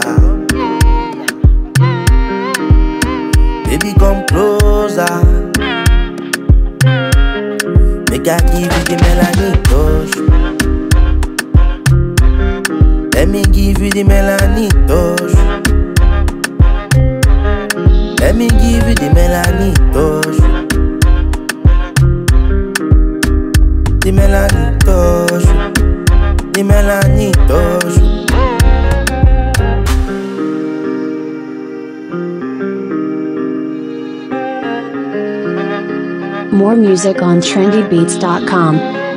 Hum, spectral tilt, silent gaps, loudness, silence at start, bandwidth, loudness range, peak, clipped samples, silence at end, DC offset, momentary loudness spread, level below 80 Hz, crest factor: none; -6 dB/octave; none; -12 LUFS; 0 s; 16 kHz; 7 LU; 0 dBFS; under 0.1%; 0 s; under 0.1%; 8 LU; -12 dBFS; 10 dB